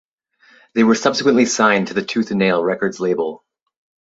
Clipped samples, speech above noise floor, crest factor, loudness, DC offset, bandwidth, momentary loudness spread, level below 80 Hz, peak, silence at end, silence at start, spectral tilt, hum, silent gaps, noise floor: under 0.1%; 38 dB; 18 dB; -17 LUFS; under 0.1%; 7.8 kHz; 7 LU; -62 dBFS; -2 dBFS; 0.75 s; 0.75 s; -4.5 dB/octave; none; none; -54 dBFS